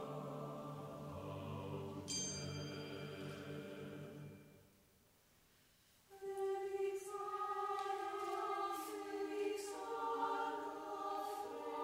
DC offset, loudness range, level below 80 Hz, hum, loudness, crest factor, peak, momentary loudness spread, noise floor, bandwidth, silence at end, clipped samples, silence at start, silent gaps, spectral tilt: under 0.1%; 9 LU; -78 dBFS; none; -45 LUFS; 18 dB; -28 dBFS; 9 LU; -72 dBFS; 16 kHz; 0 s; under 0.1%; 0 s; none; -4 dB/octave